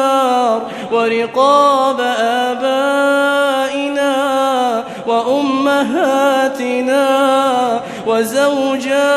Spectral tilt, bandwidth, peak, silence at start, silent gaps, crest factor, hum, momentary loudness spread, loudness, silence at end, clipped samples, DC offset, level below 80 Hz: -3.5 dB/octave; 14.5 kHz; 0 dBFS; 0 s; none; 14 dB; none; 5 LU; -14 LUFS; 0 s; under 0.1%; under 0.1%; -60 dBFS